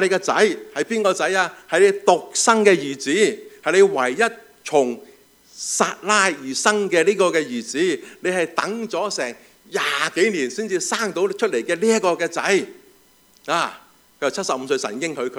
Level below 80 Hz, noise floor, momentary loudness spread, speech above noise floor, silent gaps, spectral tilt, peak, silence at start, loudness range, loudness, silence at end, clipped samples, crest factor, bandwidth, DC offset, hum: -72 dBFS; -55 dBFS; 9 LU; 35 dB; none; -3 dB/octave; 0 dBFS; 0 s; 5 LU; -20 LUFS; 0 s; under 0.1%; 20 dB; 16 kHz; under 0.1%; none